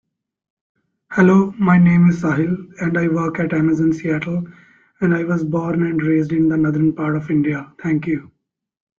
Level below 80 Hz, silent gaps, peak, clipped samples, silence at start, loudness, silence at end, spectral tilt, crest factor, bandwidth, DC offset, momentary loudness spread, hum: -52 dBFS; none; -2 dBFS; under 0.1%; 1.1 s; -18 LUFS; 0.7 s; -9 dB/octave; 16 dB; 7 kHz; under 0.1%; 10 LU; none